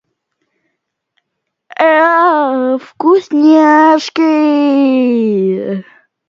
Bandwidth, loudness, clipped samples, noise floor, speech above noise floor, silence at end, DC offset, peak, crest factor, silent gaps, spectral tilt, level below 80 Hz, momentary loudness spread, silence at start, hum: 7.4 kHz; -10 LUFS; under 0.1%; -73 dBFS; 63 dB; 0.45 s; under 0.1%; 0 dBFS; 12 dB; none; -6 dB/octave; -70 dBFS; 9 LU; 1.8 s; none